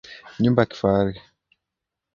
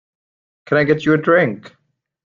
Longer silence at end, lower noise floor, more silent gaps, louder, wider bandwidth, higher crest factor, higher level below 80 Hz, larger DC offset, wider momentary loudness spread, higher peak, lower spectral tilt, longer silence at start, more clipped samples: first, 1 s vs 0.55 s; second, -84 dBFS vs under -90 dBFS; neither; second, -21 LUFS vs -16 LUFS; about the same, 7 kHz vs 7.4 kHz; about the same, 22 dB vs 18 dB; first, -50 dBFS vs -56 dBFS; neither; first, 19 LU vs 7 LU; about the same, -2 dBFS vs 0 dBFS; about the same, -8 dB/octave vs -7.5 dB/octave; second, 0.1 s vs 0.7 s; neither